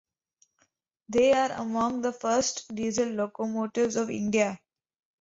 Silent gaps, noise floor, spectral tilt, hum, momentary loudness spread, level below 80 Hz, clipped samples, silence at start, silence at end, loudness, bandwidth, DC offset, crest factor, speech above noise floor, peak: none; -72 dBFS; -4 dB/octave; none; 8 LU; -64 dBFS; under 0.1%; 1.1 s; 0.65 s; -27 LUFS; 8 kHz; under 0.1%; 18 dB; 45 dB; -12 dBFS